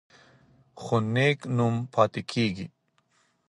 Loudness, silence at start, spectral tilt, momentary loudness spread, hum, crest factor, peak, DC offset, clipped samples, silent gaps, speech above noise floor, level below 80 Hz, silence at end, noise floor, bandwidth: -26 LUFS; 0.75 s; -6.5 dB/octave; 14 LU; none; 22 dB; -6 dBFS; under 0.1%; under 0.1%; none; 43 dB; -62 dBFS; 0.8 s; -69 dBFS; 11.5 kHz